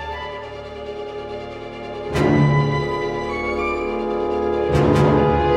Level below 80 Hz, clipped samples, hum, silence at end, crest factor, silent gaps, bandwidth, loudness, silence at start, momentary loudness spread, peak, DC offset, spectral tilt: -38 dBFS; under 0.1%; none; 0 s; 16 dB; none; 10.5 kHz; -20 LUFS; 0 s; 16 LU; -4 dBFS; under 0.1%; -7.5 dB/octave